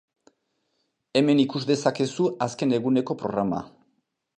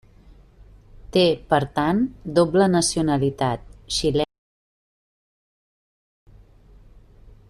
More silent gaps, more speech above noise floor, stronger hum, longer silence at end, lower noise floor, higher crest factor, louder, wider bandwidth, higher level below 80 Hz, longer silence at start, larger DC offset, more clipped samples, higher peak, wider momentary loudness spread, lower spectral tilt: neither; first, 51 dB vs 29 dB; neither; second, 0.7 s vs 3.25 s; first, -75 dBFS vs -50 dBFS; about the same, 20 dB vs 20 dB; second, -24 LUFS vs -21 LUFS; second, 9.8 kHz vs 14 kHz; second, -64 dBFS vs -46 dBFS; first, 1.15 s vs 0.6 s; neither; neither; about the same, -6 dBFS vs -4 dBFS; about the same, 6 LU vs 8 LU; about the same, -6 dB/octave vs -5 dB/octave